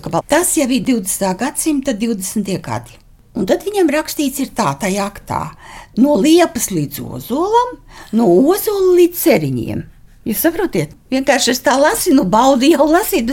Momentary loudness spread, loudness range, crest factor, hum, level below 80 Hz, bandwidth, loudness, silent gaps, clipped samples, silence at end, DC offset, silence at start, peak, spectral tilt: 12 LU; 5 LU; 14 dB; none; -42 dBFS; 17 kHz; -15 LUFS; none; under 0.1%; 0 s; under 0.1%; 0.05 s; 0 dBFS; -4.5 dB/octave